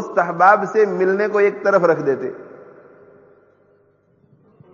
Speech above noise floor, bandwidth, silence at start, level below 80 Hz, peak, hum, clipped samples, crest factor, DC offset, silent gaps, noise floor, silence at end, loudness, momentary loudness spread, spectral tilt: 42 dB; 7.2 kHz; 0 s; -74 dBFS; 0 dBFS; 50 Hz at -60 dBFS; under 0.1%; 18 dB; under 0.1%; none; -58 dBFS; 2.1 s; -16 LUFS; 11 LU; -5.5 dB/octave